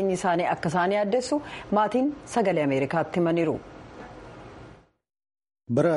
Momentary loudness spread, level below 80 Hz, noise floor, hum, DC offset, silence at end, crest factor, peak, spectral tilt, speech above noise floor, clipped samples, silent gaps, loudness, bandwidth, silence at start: 20 LU; -58 dBFS; -51 dBFS; none; under 0.1%; 0 s; 16 dB; -10 dBFS; -6 dB/octave; 26 dB; under 0.1%; none; -25 LUFS; 11.5 kHz; 0 s